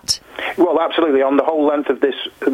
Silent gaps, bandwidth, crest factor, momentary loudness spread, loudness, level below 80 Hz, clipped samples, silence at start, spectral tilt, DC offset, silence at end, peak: none; 15.5 kHz; 16 dB; 6 LU; -17 LUFS; -56 dBFS; under 0.1%; 0.1 s; -3 dB/octave; under 0.1%; 0 s; 0 dBFS